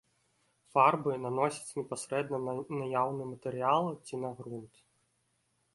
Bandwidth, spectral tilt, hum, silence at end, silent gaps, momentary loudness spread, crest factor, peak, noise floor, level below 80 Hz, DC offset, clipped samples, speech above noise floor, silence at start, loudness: 11.5 kHz; -5.5 dB/octave; none; 1.1 s; none; 13 LU; 22 dB; -12 dBFS; -76 dBFS; -76 dBFS; under 0.1%; under 0.1%; 44 dB; 0.75 s; -32 LUFS